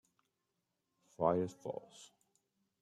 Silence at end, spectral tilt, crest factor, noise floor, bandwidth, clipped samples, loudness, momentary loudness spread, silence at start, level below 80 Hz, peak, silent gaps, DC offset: 0.75 s; -7 dB/octave; 26 dB; -86 dBFS; 12.5 kHz; under 0.1%; -38 LUFS; 23 LU; 1.2 s; -78 dBFS; -18 dBFS; none; under 0.1%